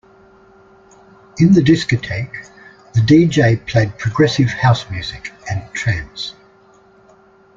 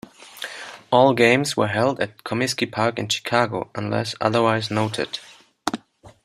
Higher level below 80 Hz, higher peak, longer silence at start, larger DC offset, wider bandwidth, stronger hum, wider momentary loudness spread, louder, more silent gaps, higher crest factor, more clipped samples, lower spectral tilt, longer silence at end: first, -44 dBFS vs -62 dBFS; about the same, 0 dBFS vs -2 dBFS; first, 1.35 s vs 0.2 s; neither; second, 7.6 kHz vs 15.5 kHz; neither; about the same, 16 LU vs 16 LU; first, -16 LUFS vs -21 LUFS; neither; about the same, 16 dB vs 20 dB; neither; first, -6.5 dB/octave vs -4.5 dB/octave; first, 1.25 s vs 0.15 s